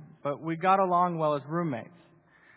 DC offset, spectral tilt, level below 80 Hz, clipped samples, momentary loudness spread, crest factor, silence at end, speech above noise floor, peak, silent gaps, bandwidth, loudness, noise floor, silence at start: under 0.1%; -10.5 dB/octave; -78 dBFS; under 0.1%; 11 LU; 18 dB; 0.7 s; 32 dB; -12 dBFS; none; 4 kHz; -28 LUFS; -60 dBFS; 0 s